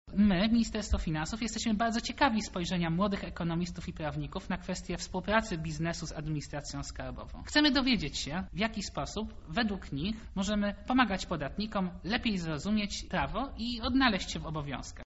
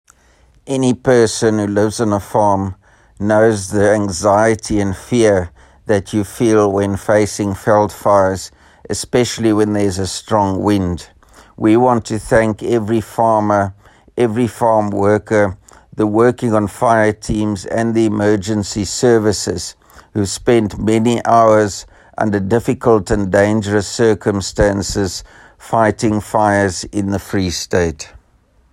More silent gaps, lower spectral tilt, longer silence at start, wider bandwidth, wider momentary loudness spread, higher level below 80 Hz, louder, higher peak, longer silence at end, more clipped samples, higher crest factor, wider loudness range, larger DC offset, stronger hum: neither; second, -4 dB/octave vs -5.5 dB/octave; second, 0.05 s vs 0.65 s; second, 8 kHz vs 16 kHz; about the same, 10 LU vs 8 LU; about the same, -44 dBFS vs -40 dBFS; second, -32 LUFS vs -15 LUFS; second, -12 dBFS vs 0 dBFS; second, 0 s vs 0.65 s; neither; first, 20 dB vs 14 dB; about the same, 3 LU vs 2 LU; neither; neither